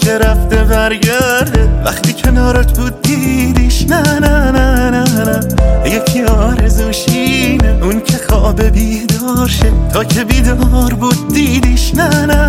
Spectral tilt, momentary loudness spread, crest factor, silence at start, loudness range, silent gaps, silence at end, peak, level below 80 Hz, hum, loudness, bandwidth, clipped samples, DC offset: -5 dB/octave; 3 LU; 10 dB; 0 s; 1 LU; none; 0 s; 0 dBFS; -14 dBFS; none; -11 LUFS; 16.5 kHz; under 0.1%; under 0.1%